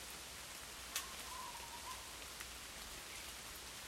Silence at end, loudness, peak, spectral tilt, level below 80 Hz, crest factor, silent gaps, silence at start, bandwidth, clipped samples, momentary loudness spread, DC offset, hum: 0 s; -48 LUFS; -26 dBFS; -0.5 dB/octave; -64 dBFS; 24 dB; none; 0 s; 16 kHz; under 0.1%; 5 LU; under 0.1%; none